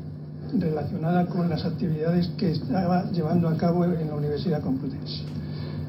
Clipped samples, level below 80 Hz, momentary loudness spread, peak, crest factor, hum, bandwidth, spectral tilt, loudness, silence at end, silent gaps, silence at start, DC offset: under 0.1%; -52 dBFS; 9 LU; -10 dBFS; 14 dB; none; 6 kHz; -9.5 dB/octave; -26 LUFS; 0 s; none; 0 s; under 0.1%